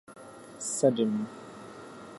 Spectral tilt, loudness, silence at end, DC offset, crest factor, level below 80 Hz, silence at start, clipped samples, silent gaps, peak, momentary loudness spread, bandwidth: -5 dB/octave; -29 LUFS; 0 s; under 0.1%; 22 dB; -74 dBFS; 0.1 s; under 0.1%; none; -10 dBFS; 22 LU; 11.5 kHz